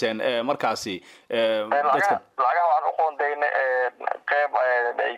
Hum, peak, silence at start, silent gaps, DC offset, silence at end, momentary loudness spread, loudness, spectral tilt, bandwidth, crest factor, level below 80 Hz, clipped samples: none; -8 dBFS; 0 s; none; under 0.1%; 0 s; 7 LU; -23 LUFS; -3.5 dB/octave; 14.5 kHz; 14 dB; -74 dBFS; under 0.1%